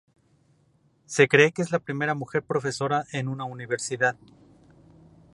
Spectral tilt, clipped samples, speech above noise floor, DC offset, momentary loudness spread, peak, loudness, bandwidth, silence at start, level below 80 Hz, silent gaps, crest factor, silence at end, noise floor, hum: -4.5 dB/octave; under 0.1%; 39 dB; under 0.1%; 12 LU; -2 dBFS; -25 LUFS; 11.5 kHz; 1.1 s; -68 dBFS; none; 24 dB; 1.2 s; -64 dBFS; none